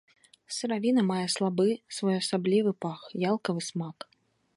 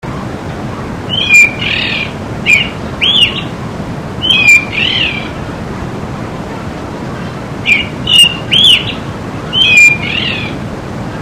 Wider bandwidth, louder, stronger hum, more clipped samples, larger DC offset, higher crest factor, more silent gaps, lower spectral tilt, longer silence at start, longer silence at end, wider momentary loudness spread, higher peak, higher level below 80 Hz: second, 11.5 kHz vs over 20 kHz; second, -29 LUFS vs -8 LUFS; neither; second, under 0.1% vs 0.7%; second, under 0.1% vs 0.4%; about the same, 16 dB vs 12 dB; neither; first, -5 dB/octave vs -2.5 dB/octave; first, 0.5 s vs 0.05 s; first, 0.65 s vs 0 s; second, 11 LU vs 17 LU; second, -14 dBFS vs 0 dBFS; second, -76 dBFS vs -34 dBFS